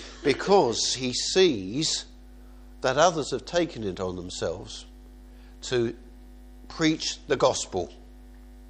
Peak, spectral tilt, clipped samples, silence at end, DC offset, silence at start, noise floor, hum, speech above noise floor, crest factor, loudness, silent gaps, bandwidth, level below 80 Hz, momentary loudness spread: -6 dBFS; -3.5 dB/octave; under 0.1%; 0 s; under 0.1%; 0 s; -47 dBFS; none; 21 dB; 22 dB; -26 LUFS; none; 10 kHz; -48 dBFS; 16 LU